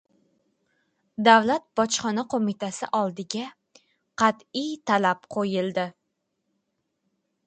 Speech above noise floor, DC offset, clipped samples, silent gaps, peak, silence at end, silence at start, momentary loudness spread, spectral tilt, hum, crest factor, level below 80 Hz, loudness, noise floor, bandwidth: 54 dB; under 0.1%; under 0.1%; none; -2 dBFS; 1.55 s; 1.2 s; 14 LU; -4 dB/octave; none; 24 dB; -70 dBFS; -24 LUFS; -78 dBFS; 9.2 kHz